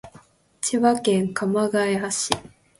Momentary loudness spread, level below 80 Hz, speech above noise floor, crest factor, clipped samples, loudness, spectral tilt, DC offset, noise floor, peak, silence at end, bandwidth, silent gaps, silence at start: 6 LU; -58 dBFS; 31 dB; 22 dB; under 0.1%; -22 LUFS; -4 dB/octave; under 0.1%; -52 dBFS; 0 dBFS; 0.3 s; 12 kHz; none; 0.05 s